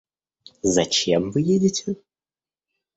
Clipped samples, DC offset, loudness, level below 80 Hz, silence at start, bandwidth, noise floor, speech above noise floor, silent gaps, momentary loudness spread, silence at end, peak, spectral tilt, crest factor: under 0.1%; under 0.1%; -21 LUFS; -56 dBFS; 0.65 s; 8.2 kHz; under -90 dBFS; over 69 dB; none; 10 LU; 1 s; -6 dBFS; -4.5 dB/octave; 18 dB